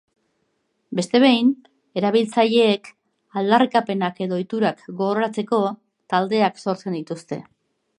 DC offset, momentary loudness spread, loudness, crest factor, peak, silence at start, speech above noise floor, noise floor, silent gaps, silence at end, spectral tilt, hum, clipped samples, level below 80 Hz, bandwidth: under 0.1%; 14 LU; -21 LUFS; 18 dB; -2 dBFS; 0.9 s; 51 dB; -70 dBFS; none; 0.55 s; -5.5 dB/octave; none; under 0.1%; -74 dBFS; 11 kHz